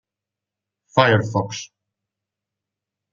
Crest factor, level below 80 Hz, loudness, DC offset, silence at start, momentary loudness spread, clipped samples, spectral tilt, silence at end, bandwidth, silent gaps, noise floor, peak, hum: 22 dB; -62 dBFS; -19 LUFS; under 0.1%; 0.95 s; 17 LU; under 0.1%; -5.5 dB/octave; 1.45 s; 7.4 kHz; none; -87 dBFS; -2 dBFS; none